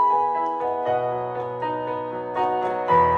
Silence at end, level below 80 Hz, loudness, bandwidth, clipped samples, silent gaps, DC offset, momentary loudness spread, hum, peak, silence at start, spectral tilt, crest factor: 0 s; -54 dBFS; -24 LUFS; 6.6 kHz; under 0.1%; none; under 0.1%; 8 LU; none; -8 dBFS; 0 s; -7.5 dB/octave; 16 dB